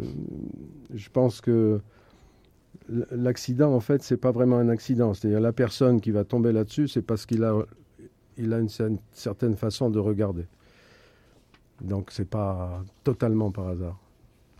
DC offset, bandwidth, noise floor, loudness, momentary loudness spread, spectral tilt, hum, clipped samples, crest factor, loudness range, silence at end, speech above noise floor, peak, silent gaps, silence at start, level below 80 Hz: under 0.1%; 14.5 kHz; -59 dBFS; -26 LUFS; 14 LU; -8 dB/octave; none; under 0.1%; 18 dB; 7 LU; 0.6 s; 34 dB; -8 dBFS; none; 0 s; -56 dBFS